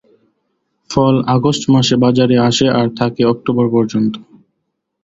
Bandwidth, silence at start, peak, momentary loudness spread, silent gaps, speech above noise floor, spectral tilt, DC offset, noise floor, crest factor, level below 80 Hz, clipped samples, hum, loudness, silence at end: 7.8 kHz; 0.9 s; 0 dBFS; 6 LU; none; 59 dB; -6 dB/octave; under 0.1%; -72 dBFS; 14 dB; -48 dBFS; under 0.1%; none; -14 LUFS; 0.8 s